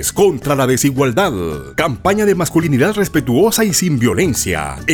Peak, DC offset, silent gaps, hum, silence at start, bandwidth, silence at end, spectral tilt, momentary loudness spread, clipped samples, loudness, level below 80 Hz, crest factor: -2 dBFS; under 0.1%; none; none; 0 s; over 20 kHz; 0 s; -4.5 dB/octave; 5 LU; under 0.1%; -15 LUFS; -38 dBFS; 12 dB